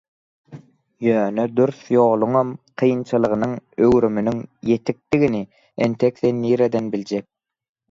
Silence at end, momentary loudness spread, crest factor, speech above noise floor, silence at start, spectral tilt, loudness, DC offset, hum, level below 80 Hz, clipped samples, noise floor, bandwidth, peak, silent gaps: 0.7 s; 9 LU; 16 dB; 24 dB; 0.5 s; -8 dB/octave; -20 LUFS; under 0.1%; none; -54 dBFS; under 0.1%; -43 dBFS; 7.6 kHz; -4 dBFS; none